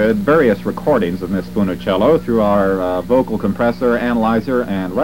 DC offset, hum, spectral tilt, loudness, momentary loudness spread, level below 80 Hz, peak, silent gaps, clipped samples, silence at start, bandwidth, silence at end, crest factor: 1%; 60 Hz at -30 dBFS; -7.5 dB/octave; -16 LUFS; 6 LU; -38 dBFS; -2 dBFS; none; under 0.1%; 0 s; 16.5 kHz; 0 s; 14 dB